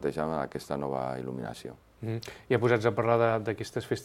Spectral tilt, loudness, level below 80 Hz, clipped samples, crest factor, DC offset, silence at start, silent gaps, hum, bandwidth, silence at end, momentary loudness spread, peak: -6.5 dB/octave; -30 LUFS; -60 dBFS; under 0.1%; 20 dB; under 0.1%; 0 s; none; none; 15.5 kHz; 0 s; 14 LU; -10 dBFS